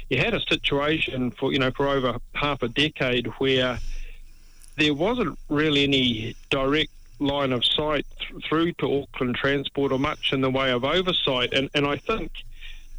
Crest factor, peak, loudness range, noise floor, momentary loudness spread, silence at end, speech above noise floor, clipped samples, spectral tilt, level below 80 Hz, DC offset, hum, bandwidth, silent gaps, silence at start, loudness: 12 dB; -12 dBFS; 2 LU; -45 dBFS; 8 LU; 0 s; 21 dB; under 0.1%; -5.5 dB/octave; -40 dBFS; under 0.1%; none; 19.5 kHz; none; 0 s; -24 LUFS